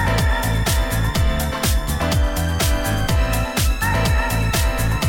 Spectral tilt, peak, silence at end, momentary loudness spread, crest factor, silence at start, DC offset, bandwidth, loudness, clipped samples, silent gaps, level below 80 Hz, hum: -4.5 dB/octave; -6 dBFS; 0 s; 2 LU; 12 dB; 0 s; under 0.1%; 17 kHz; -20 LUFS; under 0.1%; none; -22 dBFS; none